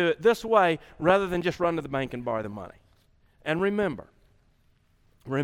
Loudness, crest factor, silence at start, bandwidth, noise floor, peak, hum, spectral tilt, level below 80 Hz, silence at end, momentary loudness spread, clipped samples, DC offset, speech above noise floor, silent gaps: -26 LUFS; 20 dB; 0 s; 16 kHz; -64 dBFS; -8 dBFS; none; -6 dB/octave; -56 dBFS; 0 s; 15 LU; under 0.1%; under 0.1%; 39 dB; none